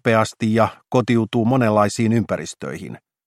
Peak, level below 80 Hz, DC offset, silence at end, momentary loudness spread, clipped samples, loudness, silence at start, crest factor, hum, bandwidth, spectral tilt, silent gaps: -2 dBFS; -56 dBFS; under 0.1%; 0.3 s; 14 LU; under 0.1%; -19 LUFS; 0.05 s; 18 dB; none; 13.5 kHz; -6.5 dB/octave; none